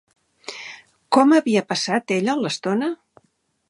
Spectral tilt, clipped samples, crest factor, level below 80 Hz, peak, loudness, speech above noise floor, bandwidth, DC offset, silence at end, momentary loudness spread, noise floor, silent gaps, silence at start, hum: -4.5 dB/octave; under 0.1%; 20 dB; -74 dBFS; -2 dBFS; -20 LUFS; 48 dB; 11.5 kHz; under 0.1%; 0.75 s; 21 LU; -67 dBFS; none; 0.5 s; none